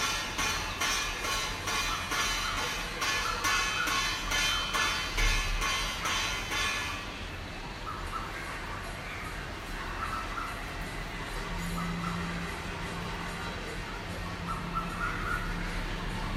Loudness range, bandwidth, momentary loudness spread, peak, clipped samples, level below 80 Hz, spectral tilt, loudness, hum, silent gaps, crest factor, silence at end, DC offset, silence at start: 8 LU; 16 kHz; 10 LU; -14 dBFS; under 0.1%; -40 dBFS; -2.5 dB/octave; -32 LUFS; none; none; 18 dB; 0 s; under 0.1%; 0 s